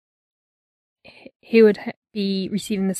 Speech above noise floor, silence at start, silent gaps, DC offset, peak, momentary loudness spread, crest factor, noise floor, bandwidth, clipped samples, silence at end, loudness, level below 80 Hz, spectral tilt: over 71 dB; 1.5 s; 1.96-2.02 s; under 0.1%; -4 dBFS; 13 LU; 18 dB; under -90 dBFS; 13 kHz; under 0.1%; 0 s; -20 LUFS; -66 dBFS; -6 dB/octave